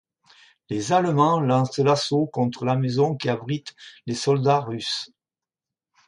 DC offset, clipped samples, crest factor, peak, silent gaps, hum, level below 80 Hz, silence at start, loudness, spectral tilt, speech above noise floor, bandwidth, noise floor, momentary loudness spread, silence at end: under 0.1%; under 0.1%; 16 dB; -6 dBFS; none; none; -66 dBFS; 0.7 s; -23 LUFS; -6 dB/octave; over 68 dB; 11.5 kHz; under -90 dBFS; 11 LU; 1 s